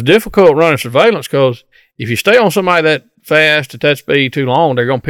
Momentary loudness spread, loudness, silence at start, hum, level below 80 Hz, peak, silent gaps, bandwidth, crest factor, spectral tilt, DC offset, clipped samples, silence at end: 6 LU; -11 LUFS; 0 s; none; -44 dBFS; 0 dBFS; none; 17.5 kHz; 12 dB; -5 dB/octave; under 0.1%; 0.6%; 0 s